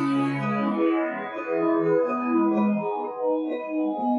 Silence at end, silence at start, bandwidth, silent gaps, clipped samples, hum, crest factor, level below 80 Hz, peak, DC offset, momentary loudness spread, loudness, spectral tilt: 0 s; 0 s; 10 kHz; none; under 0.1%; none; 12 dB; -76 dBFS; -12 dBFS; under 0.1%; 6 LU; -25 LUFS; -8.5 dB/octave